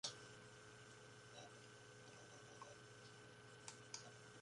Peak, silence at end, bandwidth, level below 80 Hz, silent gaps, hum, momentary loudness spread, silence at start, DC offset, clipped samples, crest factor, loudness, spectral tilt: -32 dBFS; 0 s; 11.5 kHz; -84 dBFS; none; none; 6 LU; 0.05 s; under 0.1%; under 0.1%; 28 dB; -59 LUFS; -2.5 dB/octave